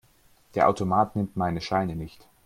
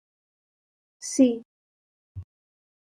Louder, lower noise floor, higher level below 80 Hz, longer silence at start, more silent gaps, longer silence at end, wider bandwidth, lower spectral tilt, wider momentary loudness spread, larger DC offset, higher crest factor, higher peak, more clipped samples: about the same, -26 LUFS vs -24 LUFS; second, -60 dBFS vs under -90 dBFS; first, -54 dBFS vs -68 dBFS; second, 0.55 s vs 1 s; second, none vs 1.45-2.15 s; second, 0.35 s vs 0.6 s; first, 15.5 kHz vs 11.5 kHz; first, -7 dB/octave vs -5 dB/octave; second, 12 LU vs 23 LU; neither; about the same, 20 dB vs 22 dB; about the same, -8 dBFS vs -8 dBFS; neither